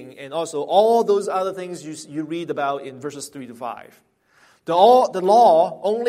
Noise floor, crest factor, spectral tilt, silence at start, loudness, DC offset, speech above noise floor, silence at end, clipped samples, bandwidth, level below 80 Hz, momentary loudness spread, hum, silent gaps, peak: -57 dBFS; 16 dB; -5 dB/octave; 0 s; -18 LUFS; under 0.1%; 38 dB; 0 s; under 0.1%; 15 kHz; -72 dBFS; 19 LU; none; none; -2 dBFS